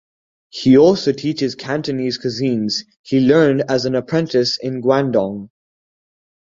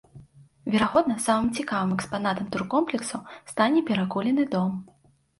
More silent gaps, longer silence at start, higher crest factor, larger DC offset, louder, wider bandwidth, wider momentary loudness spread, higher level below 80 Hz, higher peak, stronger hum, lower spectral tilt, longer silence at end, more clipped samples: first, 2.96-3.04 s vs none; first, 0.55 s vs 0.15 s; about the same, 16 dB vs 18 dB; neither; first, -17 LUFS vs -25 LUFS; second, 7.6 kHz vs 11.5 kHz; about the same, 10 LU vs 10 LU; about the same, -56 dBFS vs -58 dBFS; first, -2 dBFS vs -8 dBFS; neither; about the same, -6 dB/octave vs -5 dB/octave; first, 1.05 s vs 0.55 s; neither